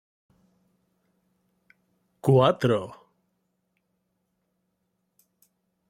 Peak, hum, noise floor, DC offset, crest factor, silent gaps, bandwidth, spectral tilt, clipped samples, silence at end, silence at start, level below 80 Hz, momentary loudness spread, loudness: -8 dBFS; none; -77 dBFS; under 0.1%; 22 dB; none; 14 kHz; -7.5 dB/octave; under 0.1%; 2.95 s; 2.25 s; -68 dBFS; 11 LU; -23 LUFS